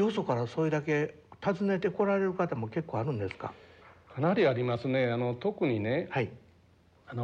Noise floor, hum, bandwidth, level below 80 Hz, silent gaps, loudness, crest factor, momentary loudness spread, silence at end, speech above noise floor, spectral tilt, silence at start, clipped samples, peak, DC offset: -62 dBFS; none; 8.8 kHz; -70 dBFS; none; -31 LUFS; 16 dB; 10 LU; 0 s; 32 dB; -8 dB/octave; 0 s; under 0.1%; -16 dBFS; under 0.1%